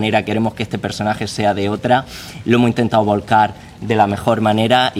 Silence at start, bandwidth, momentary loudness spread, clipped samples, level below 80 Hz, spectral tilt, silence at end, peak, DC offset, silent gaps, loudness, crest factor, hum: 0 s; 16 kHz; 7 LU; under 0.1%; -48 dBFS; -6 dB/octave; 0 s; 0 dBFS; under 0.1%; none; -16 LUFS; 16 dB; none